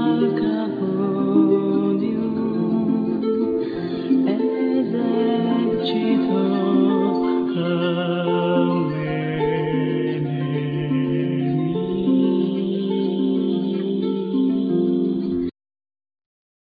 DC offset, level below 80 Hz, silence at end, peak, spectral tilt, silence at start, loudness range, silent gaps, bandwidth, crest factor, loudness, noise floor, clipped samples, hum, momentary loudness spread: under 0.1%; -56 dBFS; 1.25 s; -6 dBFS; -10.5 dB/octave; 0 s; 2 LU; none; 4.9 kHz; 16 dB; -21 LUFS; under -90 dBFS; under 0.1%; none; 5 LU